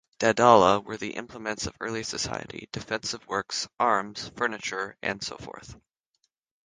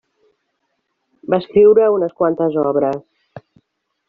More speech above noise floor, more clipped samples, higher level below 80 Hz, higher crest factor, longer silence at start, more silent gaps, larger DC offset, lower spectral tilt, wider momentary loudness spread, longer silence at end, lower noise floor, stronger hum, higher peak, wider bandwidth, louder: second, 49 dB vs 57 dB; neither; about the same, -56 dBFS vs -58 dBFS; first, 26 dB vs 16 dB; second, 0.2 s vs 1.3 s; neither; neither; second, -3.5 dB/octave vs -6.5 dB/octave; first, 18 LU vs 11 LU; first, 0.9 s vs 0.7 s; first, -76 dBFS vs -71 dBFS; neither; about the same, -2 dBFS vs -2 dBFS; first, 10 kHz vs 4.5 kHz; second, -26 LUFS vs -15 LUFS